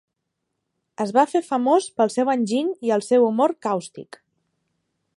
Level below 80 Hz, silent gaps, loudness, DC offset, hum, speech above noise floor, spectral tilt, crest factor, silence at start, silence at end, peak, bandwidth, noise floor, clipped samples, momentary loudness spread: -78 dBFS; none; -21 LUFS; under 0.1%; none; 58 dB; -5 dB/octave; 18 dB; 1 s; 1.15 s; -4 dBFS; 11.5 kHz; -79 dBFS; under 0.1%; 9 LU